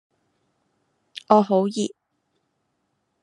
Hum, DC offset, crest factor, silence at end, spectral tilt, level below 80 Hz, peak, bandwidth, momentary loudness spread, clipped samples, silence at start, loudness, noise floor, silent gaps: none; under 0.1%; 26 dB; 1.35 s; -6 dB/octave; -70 dBFS; 0 dBFS; 11 kHz; 23 LU; under 0.1%; 1.3 s; -21 LUFS; -73 dBFS; none